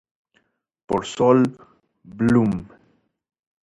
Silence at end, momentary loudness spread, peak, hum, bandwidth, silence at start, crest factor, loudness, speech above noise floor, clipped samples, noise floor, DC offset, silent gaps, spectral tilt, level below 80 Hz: 1 s; 9 LU; -4 dBFS; none; 10.5 kHz; 0.9 s; 18 dB; -20 LUFS; 48 dB; under 0.1%; -67 dBFS; under 0.1%; none; -7 dB/octave; -52 dBFS